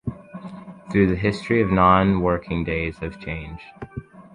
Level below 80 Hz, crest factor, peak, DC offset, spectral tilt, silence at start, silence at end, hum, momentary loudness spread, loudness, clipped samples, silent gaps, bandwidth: -40 dBFS; 18 dB; -4 dBFS; under 0.1%; -8 dB/octave; 0.05 s; 0.15 s; none; 22 LU; -21 LUFS; under 0.1%; none; 10 kHz